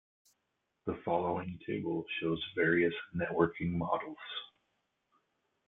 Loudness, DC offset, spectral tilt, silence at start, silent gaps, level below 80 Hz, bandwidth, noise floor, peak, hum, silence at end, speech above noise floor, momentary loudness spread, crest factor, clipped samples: -34 LUFS; under 0.1%; -8.5 dB/octave; 0.85 s; none; -66 dBFS; 4.1 kHz; -83 dBFS; -14 dBFS; none; 1.2 s; 49 dB; 12 LU; 22 dB; under 0.1%